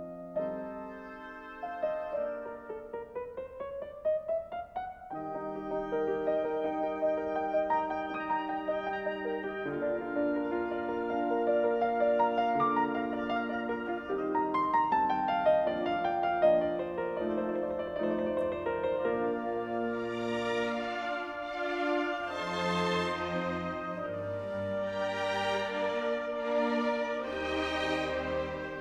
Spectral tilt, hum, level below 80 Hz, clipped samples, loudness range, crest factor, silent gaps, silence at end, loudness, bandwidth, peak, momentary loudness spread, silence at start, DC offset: -6 dB/octave; none; -60 dBFS; under 0.1%; 7 LU; 18 dB; none; 0 s; -32 LUFS; 10 kHz; -14 dBFS; 11 LU; 0 s; under 0.1%